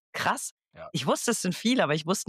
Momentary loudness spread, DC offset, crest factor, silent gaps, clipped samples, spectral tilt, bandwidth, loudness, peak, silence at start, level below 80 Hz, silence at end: 11 LU; under 0.1%; 16 dB; 0.51-0.57 s; under 0.1%; -3.5 dB/octave; 16 kHz; -27 LUFS; -12 dBFS; 0.15 s; -74 dBFS; 0.05 s